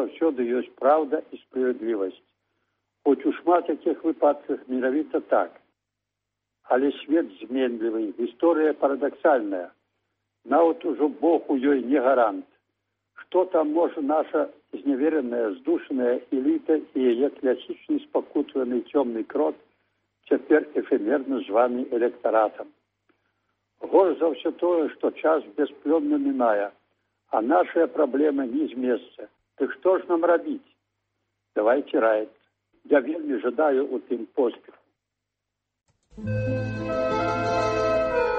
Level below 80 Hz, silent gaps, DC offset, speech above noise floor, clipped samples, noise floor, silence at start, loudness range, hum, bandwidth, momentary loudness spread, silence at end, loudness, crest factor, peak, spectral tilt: -58 dBFS; none; under 0.1%; 60 dB; under 0.1%; -84 dBFS; 0 s; 3 LU; none; 7.2 kHz; 8 LU; 0 s; -24 LUFS; 18 dB; -8 dBFS; -7.5 dB/octave